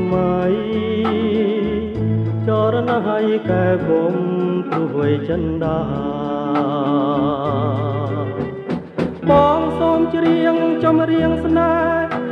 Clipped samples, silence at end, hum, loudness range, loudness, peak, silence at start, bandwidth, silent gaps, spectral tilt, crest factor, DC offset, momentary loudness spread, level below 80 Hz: under 0.1%; 0 s; none; 4 LU; -18 LUFS; -2 dBFS; 0 s; 6.2 kHz; none; -9 dB/octave; 16 dB; under 0.1%; 7 LU; -42 dBFS